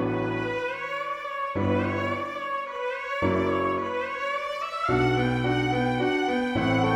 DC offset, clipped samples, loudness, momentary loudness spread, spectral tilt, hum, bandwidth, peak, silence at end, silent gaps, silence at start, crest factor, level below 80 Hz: under 0.1%; under 0.1%; -27 LUFS; 7 LU; -6.5 dB/octave; none; 13 kHz; -12 dBFS; 0 s; none; 0 s; 14 dB; -50 dBFS